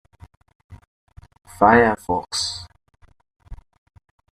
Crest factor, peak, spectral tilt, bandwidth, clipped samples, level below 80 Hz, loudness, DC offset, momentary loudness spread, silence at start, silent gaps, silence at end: 22 dB; -2 dBFS; -4 dB/octave; 14 kHz; under 0.1%; -48 dBFS; -18 LUFS; under 0.1%; 12 LU; 0.7 s; 0.87-1.07 s, 3.36-3.40 s; 0.8 s